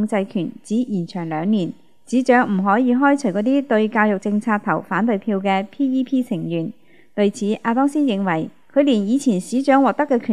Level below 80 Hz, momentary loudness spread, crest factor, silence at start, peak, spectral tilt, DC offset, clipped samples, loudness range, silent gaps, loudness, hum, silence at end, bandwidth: -72 dBFS; 8 LU; 18 dB; 0 s; -2 dBFS; -6.5 dB/octave; 0.4%; under 0.1%; 3 LU; none; -19 LUFS; none; 0 s; 11.5 kHz